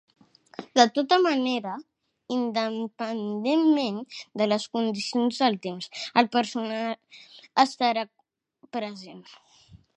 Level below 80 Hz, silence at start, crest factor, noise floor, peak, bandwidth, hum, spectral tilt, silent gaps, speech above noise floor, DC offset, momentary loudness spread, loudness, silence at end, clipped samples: -74 dBFS; 0.6 s; 22 dB; -61 dBFS; -4 dBFS; 9.4 kHz; none; -4 dB/octave; none; 35 dB; under 0.1%; 15 LU; -26 LUFS; 0.2 s; under 0.1%